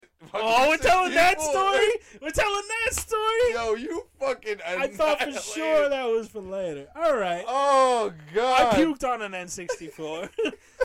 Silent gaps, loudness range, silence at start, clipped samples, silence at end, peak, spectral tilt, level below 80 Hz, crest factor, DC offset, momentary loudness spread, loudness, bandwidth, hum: none; 4 LU; 0.2 s; under 0.1%; 0 s; -10 dBFS; -3 dB/octave; -48 dBFS; 14 dB; under 0.1%; 13 LU; -24 LUFS; 16.5 kHz; none